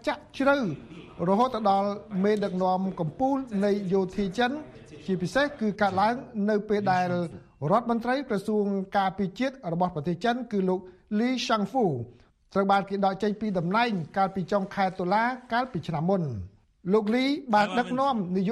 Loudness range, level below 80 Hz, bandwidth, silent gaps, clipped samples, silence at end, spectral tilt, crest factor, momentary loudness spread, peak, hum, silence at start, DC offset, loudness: 1 LU; -58 dBFS; 12 kHz; none; under 0.1%; 0 s; -6.5 dB/octave; 16 dB; 8 LU; -10 dBFS; none; 0.05 s; under 0.1%; -27 LUFS